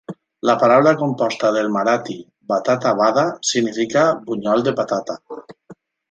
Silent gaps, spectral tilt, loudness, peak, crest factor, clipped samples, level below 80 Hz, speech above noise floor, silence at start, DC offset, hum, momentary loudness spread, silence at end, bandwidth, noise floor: none; -4.5 dB/octave; -18 LUFS; 0 dBFS; 18 dB; under 0.1%; -64 dBFS; 29 dB; 0.1 s; under 0.1%; none; 18 LU; 0.35 s; 9.2 kHz; -46 dBFS